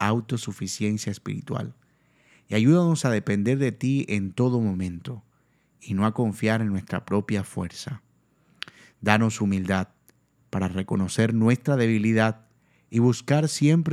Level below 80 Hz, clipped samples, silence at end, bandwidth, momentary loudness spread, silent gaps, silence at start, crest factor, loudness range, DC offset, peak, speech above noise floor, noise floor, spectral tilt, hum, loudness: -62 dBFS; under 0.1%; 0 s; 14 kHz; 16 LU; none; 0 s; 24 dB; 4 LU; under 0.1%; 0 dBFS; 42 dB; -65 dBFS; -6.5 dB/octave; none; -24 LUFS